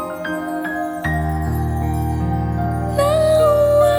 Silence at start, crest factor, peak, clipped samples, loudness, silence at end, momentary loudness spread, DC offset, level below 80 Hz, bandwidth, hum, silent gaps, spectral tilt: 0 s; 14 dB; -4 dBFS; under 0.1%; -19 LUFS; 0 s; 10 LU; under 0.1%; -28 dBFS; over 20 kHz; none; none; -7 dB/octave